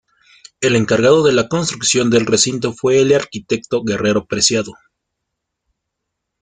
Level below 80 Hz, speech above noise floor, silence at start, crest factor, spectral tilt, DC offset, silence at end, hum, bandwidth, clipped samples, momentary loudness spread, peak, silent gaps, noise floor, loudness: -52 dBFS; 62 dB; 0.6 s; 16 dB; -3.5 dB/octave; under 0.1%; 1.7 s; none; 9.8 kHz; under 0.1%; 8 LU; 0 dBFS; none; -77 dBFS; -15 LUFS